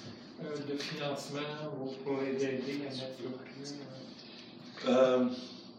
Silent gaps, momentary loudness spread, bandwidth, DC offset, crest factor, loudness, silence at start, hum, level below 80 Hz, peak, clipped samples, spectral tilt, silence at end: none; 20 LU; 12.5 kHz; under 0.1%; 20 dB; -35 LUFS; 0 s; none; -82 dBFS; -16 dBFS; under 0.1%; -5.5 dB/octave; 0 s